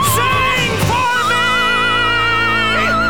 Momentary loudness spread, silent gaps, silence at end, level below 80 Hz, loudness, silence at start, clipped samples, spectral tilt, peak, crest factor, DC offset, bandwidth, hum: 2 LU; none; 0 s; -34 dBFS; -13 LUFS; 0 s; under 0.1%; -3 dB/octave; -4 dBFS; 10 dB; 2%; over 20 kHz; none